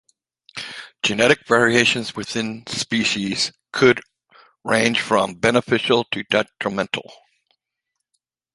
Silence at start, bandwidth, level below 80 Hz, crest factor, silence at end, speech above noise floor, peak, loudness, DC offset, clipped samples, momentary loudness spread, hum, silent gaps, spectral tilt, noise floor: 0.55 s; 11.5 kHz; -58 dBFS; 20 dB; 1.4 s; 61 dB; 0 dBFS; -19 LUFS; under 0.1%; under 0.1%; 12 LU; none; none; -3.5 dB/octave; -80 dBFS